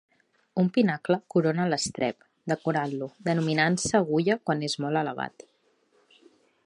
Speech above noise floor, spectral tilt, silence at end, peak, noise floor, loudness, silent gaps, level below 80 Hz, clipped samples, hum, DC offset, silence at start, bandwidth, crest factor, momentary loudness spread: 41 dB; -5 dB/octave; 1.35 s; -8 dBFS; -67 dBFS; -27 LUFS; none; -64 dBFS; under 0.1%; none; under 0.1%; 0.55 s; 11.5 kHz; 20 dB; 8 LU